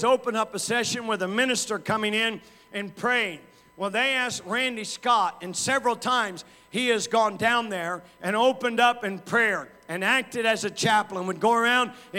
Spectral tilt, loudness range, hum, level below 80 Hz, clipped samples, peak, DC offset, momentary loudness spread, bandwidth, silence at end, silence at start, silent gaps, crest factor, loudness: -2.5 dB/octave; 2 LU; none; -70 dBFS; under 0.1%; -6 dBFS; under 0.1%; 9 LU; 17 kHz; 0 s; 0 s; none; 18 dB; -25 LUFS